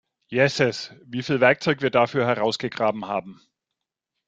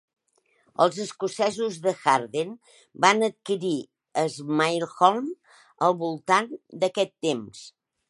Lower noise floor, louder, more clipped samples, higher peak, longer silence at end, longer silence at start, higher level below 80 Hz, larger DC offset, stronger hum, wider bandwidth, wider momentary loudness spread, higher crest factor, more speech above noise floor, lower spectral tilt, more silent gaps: first, -84 dBFS vs -68 dBFS; first, -22 LUFS vs -25 LUFS; neither; about the same, -2 dBFS vs -2 dBFS; first, 0.95 s vs 0.4 s; second, 0.3 s vs 0.8 s; first, -62 dBFS vs -76 dBFS; neither; neither; second, 9.2 kHz vs 11.5 kHz; about the same, 11 LU vs 12 LU; about the same, 22 dB vs 24 dB; first, 62 dB vs 43 dB; first, -5.5 dB/octave vs -4 dB/octave; neither